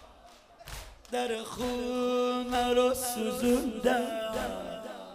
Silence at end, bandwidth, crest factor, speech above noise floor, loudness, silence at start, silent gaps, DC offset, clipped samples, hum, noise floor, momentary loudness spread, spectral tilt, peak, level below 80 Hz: 0 s; 15.5 kHz; 18 dB; 26 dB; -30 LUFS; 0 s; none; under 0.1%; under 0.1%; none; -55 dBFS; 17 LU; -3.5 dB/octave; -14 dBFS; -52 dBFS